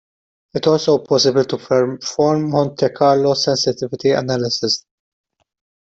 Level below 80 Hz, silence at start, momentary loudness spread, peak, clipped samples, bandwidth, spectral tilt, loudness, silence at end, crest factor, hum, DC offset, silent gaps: -58 dBFS; 0.55 s; 6 LU; -4 dBFS; under 0.1%; 8 kHz; -5 dB/octave; -17 LUFS; 1.1 s; 14 dB; none; under 0.1%; none